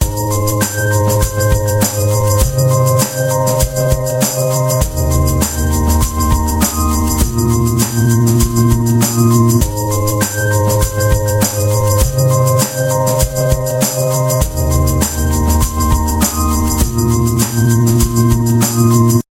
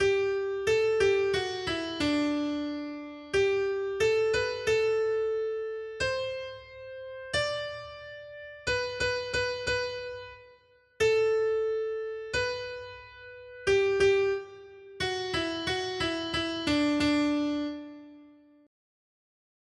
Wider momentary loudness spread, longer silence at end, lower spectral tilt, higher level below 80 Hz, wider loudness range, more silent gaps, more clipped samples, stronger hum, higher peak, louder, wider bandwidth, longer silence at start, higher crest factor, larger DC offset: second, 3 LU vs 18 LU; second, 0.15 s vs 1.35 s; first, -5.5 dB/octave vs -4 dB/octave; first, -20 dBFS vs -56 dBFS; second, 2 LU vs 5 LU; neither; neither; neither; first, 0 dBFS vs -14 dBFS; first, -13 LUFS vs -29 LUFS; first, 17 kHz vs 11.5 kHz; about the same, 0 s vs 0 s; about the same, 12 dB vs 16 dB; neither